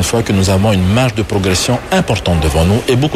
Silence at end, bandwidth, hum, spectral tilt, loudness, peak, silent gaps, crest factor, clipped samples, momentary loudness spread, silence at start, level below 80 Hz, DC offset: 0 s; 15 kHz; none; -5 dB/octave; -13 LUFS; -2 dBFS; none; 10 dB; under 0.1%; 3 LU; 0 s; -26 dBFS; under 0.1%